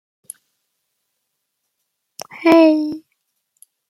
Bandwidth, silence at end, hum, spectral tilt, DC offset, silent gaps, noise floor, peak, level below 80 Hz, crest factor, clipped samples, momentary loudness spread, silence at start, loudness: 15 kHz; 0.9 s; none; -4.5 dB/octave; under 0.1%; none; -75 dBFS; -2 dBFS; -66 dBFS; 18 dB; under 0.1%; 27 LU; 2.35 s; -14 LUFS